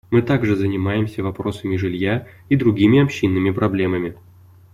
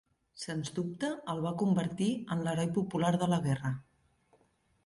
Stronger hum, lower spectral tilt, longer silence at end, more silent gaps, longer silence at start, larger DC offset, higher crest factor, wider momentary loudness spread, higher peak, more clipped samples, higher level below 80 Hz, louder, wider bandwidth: neither; first, -8 dB/octave vs -6.5 dB/octave; second, 0.6 s vs 1.05 s; neither; second, 0.1 s vs 0.35 s; neither; about the same, 16 dB vs 16 dB; about the same, 10 LU vs 8 LU; first, -2 dBFS vs -18 dBFS; neither; first, -50 dBFS vs -66 dBFS; first, -19 LUFS vs -33 LUFS; first, 13.5 kHz vs 11.5 kHz